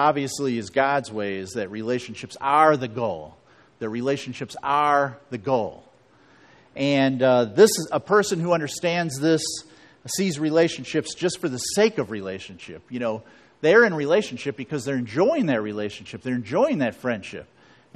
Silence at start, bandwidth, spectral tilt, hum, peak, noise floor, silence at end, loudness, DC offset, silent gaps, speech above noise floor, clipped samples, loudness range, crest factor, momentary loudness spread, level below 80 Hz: 0 s; 13.5 kHz; -4.5 dB/octave; none; -4 dBFS; -56 dBFS; 0.5 s; -23 LUFS; under 0.1%; none; 33 dB; under 0.1%; 4 LU; 20 dB; 16 LU; -64 dBFS